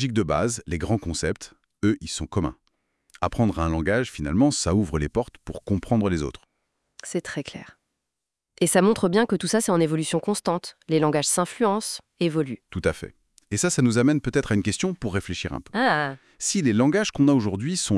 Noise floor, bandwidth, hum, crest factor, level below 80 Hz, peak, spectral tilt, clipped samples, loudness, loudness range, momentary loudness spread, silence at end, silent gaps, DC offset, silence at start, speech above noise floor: -84 dBFS; 12 kHz; none; 18 dB; -46 dBFS; -6 dBFS; -5 dB/octave; under 0.1%; -24 LUFS; 5 LU; 11 LU; 0 s; none; under 0.1%; 0 s; 61 dB